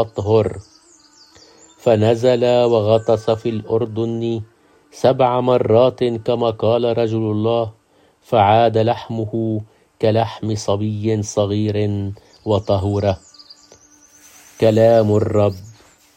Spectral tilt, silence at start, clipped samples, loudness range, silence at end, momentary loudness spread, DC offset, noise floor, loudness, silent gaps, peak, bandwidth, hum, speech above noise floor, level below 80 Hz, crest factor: -7 dB/octave; 0 s; under 0.1%; 3 LU; 0.45 s; 10 LU; under 0.1%; -50 dBFS; -17 LUFS; none; 0 dBFS; 9.6 kHz; none; 33 dB; -54 dBFS; 16 dB